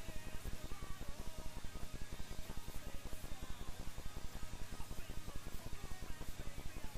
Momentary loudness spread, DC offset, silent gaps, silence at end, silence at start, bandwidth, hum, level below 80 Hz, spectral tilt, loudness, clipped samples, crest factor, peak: 1 LU; 0.3%; none; 0 s; 0 s; 15.5 kHz; none; -50 dBFS; -4 dB/octave; -51 LUFS; under 0.1%; 10 dB; -30 dBFS